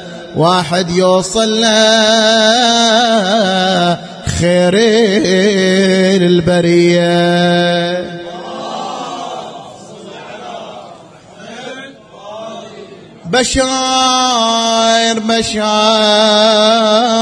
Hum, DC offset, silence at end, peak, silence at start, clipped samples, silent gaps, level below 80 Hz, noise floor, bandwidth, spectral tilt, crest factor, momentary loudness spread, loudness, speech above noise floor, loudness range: none; under 0.1%; 0 s; 0 dBFS; 0 s; under 0.1%; none; -40 dBFS; -37 dBFS; 10.5 kHz; -4 dB/octave; 12 dB; 20 LU; -11 LUFS; 26 dB; 17 LU